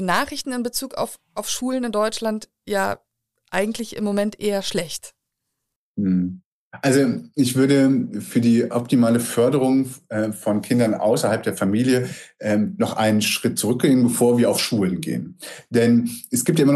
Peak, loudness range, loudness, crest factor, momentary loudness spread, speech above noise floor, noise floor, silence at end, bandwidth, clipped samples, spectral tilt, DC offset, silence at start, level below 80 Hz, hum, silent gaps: -6 dBFS; 6 LU; -21 LUFS; 16 dB; 11 LU; 59 dB; -79 dBFS; 0 s; 14 kHz; under 0.1%; -5 dB/octave; under 0.1%; 0 s; -58 dBFS; none; 5.76-5.95 s, 6.45-6.71 s